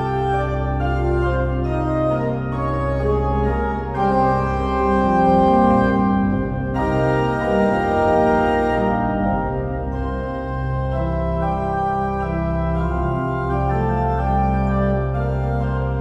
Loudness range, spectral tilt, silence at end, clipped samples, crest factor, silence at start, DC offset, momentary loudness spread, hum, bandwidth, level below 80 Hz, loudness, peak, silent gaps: 5 LU; -9 dB/octave; 0 s; under 0.1%; 14 dB; 0 s; under 0.1%; 7 LU; none; 8.2 kHz; -28 dBFS; -20 LUFS; -4 dBFS; none